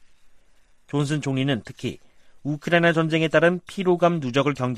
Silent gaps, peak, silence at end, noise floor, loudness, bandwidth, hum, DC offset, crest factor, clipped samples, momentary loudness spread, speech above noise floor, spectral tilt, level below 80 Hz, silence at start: none; -6 dBFS; 0 s; -54 dBFS; -22 LUFS; 12.5 kHz; none; under 0.1%; 18 dB; under 0.1%; 13 LU; 32 dB; -6.5 dB/octave; -58 dBFS; 0.25 s